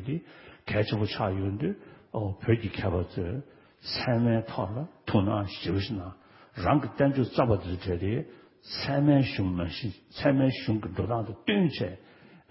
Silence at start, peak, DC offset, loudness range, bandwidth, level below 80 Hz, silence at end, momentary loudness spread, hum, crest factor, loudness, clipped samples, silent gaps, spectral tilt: 0 s; -10 dBFS; under 0.1%; 3 LU; 5.8 kHz; -46 dBFS; 0.5 s; 12 LU; none; 20 dB; -29 LUFS; under 0.1%; none; -11 dB/octave